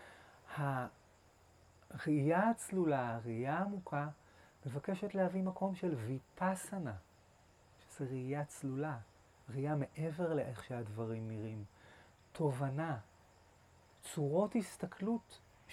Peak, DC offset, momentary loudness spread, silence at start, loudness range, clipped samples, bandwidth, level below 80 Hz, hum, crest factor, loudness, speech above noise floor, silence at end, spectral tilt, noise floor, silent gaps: -22 dBFS; under 0.1%; 15 LU; 0 s; 5 LU; under 0.1%; 14.5 kHz; -74 dBFS; none; 18 dB; -39 LUFS; 28 dB; 0 s; -7 dB/octave; -66 dBFS; none